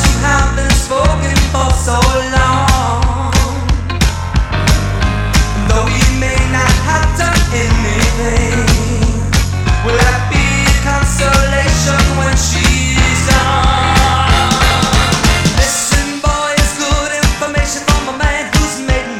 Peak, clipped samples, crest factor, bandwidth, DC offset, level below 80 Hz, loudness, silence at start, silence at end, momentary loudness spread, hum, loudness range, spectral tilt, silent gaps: 0 dBFS; under 0.1%; 12 dB; 16.5 kHz; under 0.1%; -16 dBFS; -12 LUFS; 0 s; 0 s; 4 LU; none; 3 LU; -4 dB/octave; none